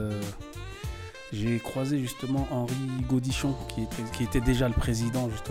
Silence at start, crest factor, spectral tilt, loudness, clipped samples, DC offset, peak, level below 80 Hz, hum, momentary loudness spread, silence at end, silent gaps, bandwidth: 0 s; 18 dB; -6 dB/octave; -30 LUFS; under 0.1%; under 0.1%; -12 dBFS; -38 dBFS; none; 12 LU; 0 s; none; 16.5 kHz